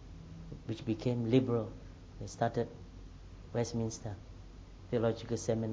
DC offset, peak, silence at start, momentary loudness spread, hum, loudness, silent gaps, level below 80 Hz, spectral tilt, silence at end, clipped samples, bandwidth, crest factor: under 0.1%; -14 dBFS; 0 s; 23 LU; none; -35 LUFS; none; -54 dBFS; -6.5 dB/octave; 0 s; under 0.1%; 8 kHz; 22 dB